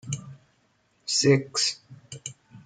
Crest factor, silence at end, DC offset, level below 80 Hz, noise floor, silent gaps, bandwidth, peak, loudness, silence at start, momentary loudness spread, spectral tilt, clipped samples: 20 dB; 0.05 s; under 0.1%; -68 dBFS; -67 dBFS; none; 9.6 kHz; -8 dBFS; -24 LUFS; 0.05 s; 20 LU; -3.5 dB/octave; under 0.1%